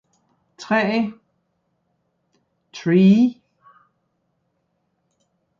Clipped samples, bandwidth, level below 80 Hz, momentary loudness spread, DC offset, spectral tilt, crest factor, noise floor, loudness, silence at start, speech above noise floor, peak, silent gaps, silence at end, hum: under 0.1%; 7.2 kHz; -68 dBFS; 19 LU; under 0.1%; -7.5 dB/octave; 18 dB; -71 dBFS; -18 LUFS; 0.6 s; 55 dB; -4 dBFS; none; 2.3 s; none